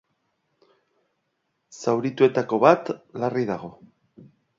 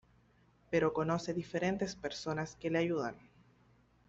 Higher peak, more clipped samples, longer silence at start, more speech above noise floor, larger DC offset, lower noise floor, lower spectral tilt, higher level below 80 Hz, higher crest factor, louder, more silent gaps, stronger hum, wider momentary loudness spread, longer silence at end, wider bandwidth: first, -2 dBFS vs -18 dBFS; neither; first, 1.75 s vs 0.7 s; first, 53 dB vs 33 dB; neither; first, -75 dBFS vs -68 dBFS; about the same, -6.5 dB/octave vs -6 dB/octave; about the same, -70 dBFS vs -66 dBFS; about the same, 24 dB vs 20 dB; first, -23 LUFS vs -36 LUFS; neither; neither; first, 15 LU vs 6 LU; about the same, 0.9 s vs 0.9 s; about the same, 7.6 kHz vs 8 kHz